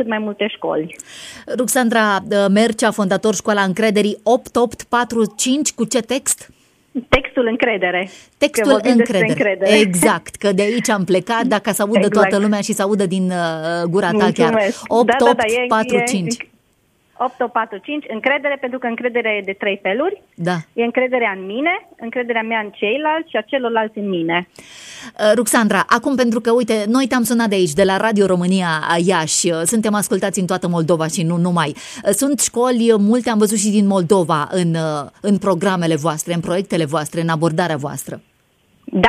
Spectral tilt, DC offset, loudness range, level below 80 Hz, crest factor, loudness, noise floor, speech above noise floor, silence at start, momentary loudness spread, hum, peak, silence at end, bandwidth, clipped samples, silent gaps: -4.5 dB/octave; under 0.1%; 4 LU; -48 dBFS; 16 dB; -17 LUFS; -60 dBFS; 43 dB; 0 s; 8 LU; none; 0 dBFS; 0 s; 15.5 kHz; under 0.1%; none